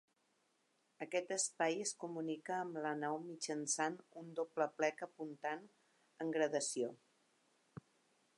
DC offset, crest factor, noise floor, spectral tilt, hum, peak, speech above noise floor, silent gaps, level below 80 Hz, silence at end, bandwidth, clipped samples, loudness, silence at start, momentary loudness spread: under 0.1%; 22 dB; -80 dBFS; -3 dB/octave; none; -22 dBFS; 39 dB; none; under -90 dBFS; 1.4 s; 11.5 kHz; under 0.1%; -41 LUFS; 1 s; 12 LU